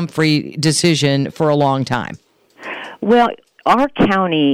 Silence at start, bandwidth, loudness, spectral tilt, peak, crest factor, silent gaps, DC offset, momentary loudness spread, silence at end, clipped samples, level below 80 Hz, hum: 0 s; 15.5 kHz; -16 LUFS; -5 dB/octave; -4 dBFS; 12 dB; none; under 0.1%; 14 LU; 0 s; under 0.1%; -44 dBFS; none